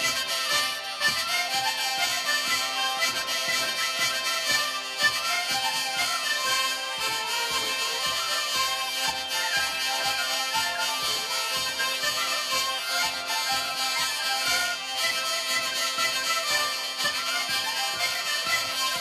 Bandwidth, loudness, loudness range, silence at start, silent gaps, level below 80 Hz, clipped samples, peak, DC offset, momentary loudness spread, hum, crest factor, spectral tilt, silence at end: 14 kHz; -25 LUFS; 1 LU; 0 s; none; -64 dBFS; under 0.1%; -10 dBFS; under 0.1%; 2 LU; none; 16 dB; 1 dB/octave; 0 s